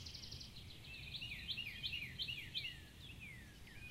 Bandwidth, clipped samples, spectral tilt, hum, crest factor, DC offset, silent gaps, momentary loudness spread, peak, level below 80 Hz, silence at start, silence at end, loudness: 16 kHz; under 0.1%; -2.5 dB/octave; none; 20 dB; under 0.1%; none; 11 LU; -30 dBFS; -62 dBFS; 0 s; 0 s; -47 LUFS